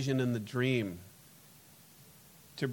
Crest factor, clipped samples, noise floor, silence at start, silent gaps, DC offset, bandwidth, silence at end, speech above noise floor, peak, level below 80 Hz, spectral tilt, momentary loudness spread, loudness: 18 dB; under 0.1%; -58 dBFS; 0 s; none; under 0.1%; 17.5 kHz; 0 s; 26 dB; -18 dBFS; -72 dBFS; -6.5 dB/octave; 24 LU; -33 LUFS